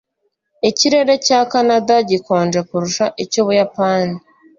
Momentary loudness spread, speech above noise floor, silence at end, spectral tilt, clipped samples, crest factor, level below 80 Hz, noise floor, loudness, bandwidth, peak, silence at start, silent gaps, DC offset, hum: 6 LU; 54 dB; 0.4 s; -4 dB/octave; under 0.1%; 14 dB; -58 dBFS; -69 dBFS; -15 LUFS; 7.6 kHz; -2 dBFS; 0.65 s; none; under 0.1%; none